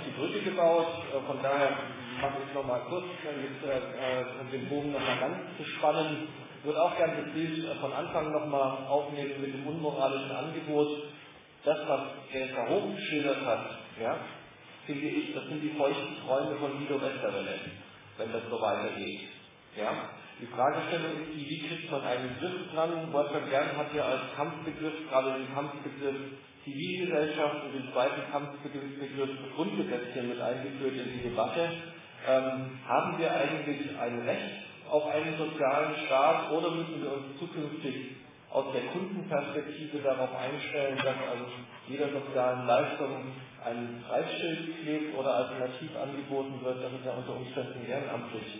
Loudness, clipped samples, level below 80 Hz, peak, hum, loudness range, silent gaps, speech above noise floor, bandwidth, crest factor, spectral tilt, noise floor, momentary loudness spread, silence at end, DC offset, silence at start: -33 LUFS; under 0.1%; -70 dBFS; -14 dBFS; none; 4 LU; none; 20 dB; 3.9 kHz; 20 dB; -3.5 dB/octave; -53 dBFS; 10 LU; 0 s; under 0.1%; 0 s